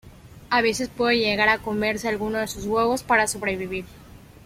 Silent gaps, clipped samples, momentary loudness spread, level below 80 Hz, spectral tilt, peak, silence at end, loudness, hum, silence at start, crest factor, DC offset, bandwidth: none; under 0.1%; 8 LU; -50 dBFS; -3.5 dB/octave; -6 dBFS; 0.25 s; -23 LUFS; none; 0.05 s; 18 dB; under 0.1%; 16.5 kHz